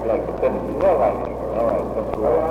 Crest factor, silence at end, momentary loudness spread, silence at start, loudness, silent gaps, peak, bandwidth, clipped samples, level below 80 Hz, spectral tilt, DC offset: 14 dB; 0 s; 7 LU; 0 s; -21 LUFS; none; -6 dBFS; 13 kHz; under 0.1%; -38 dBFS; -8.5 dB/octave; under 0.1%